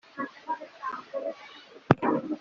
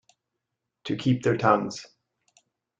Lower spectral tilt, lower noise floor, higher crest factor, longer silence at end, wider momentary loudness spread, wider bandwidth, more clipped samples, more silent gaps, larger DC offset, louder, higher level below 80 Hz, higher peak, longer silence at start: about the same, -6 dB/octave vs -6.5 dB/octave; second, -49 dBFS vs -83 dBFS; first, 28 dB vs 22 dB; second, 0 s vs 0.95 s; first, 20 LU vs 17 LU; second, 7.2 kHz vs 8.8 kHz; neither; neither; neither; second, -31 LUFS vs -25 LUFS; about the same, -66 dBFS vs -64 dBFS; first, -2 dBFS vs -6 dBFS; second, 0.15 s vs 0.85 s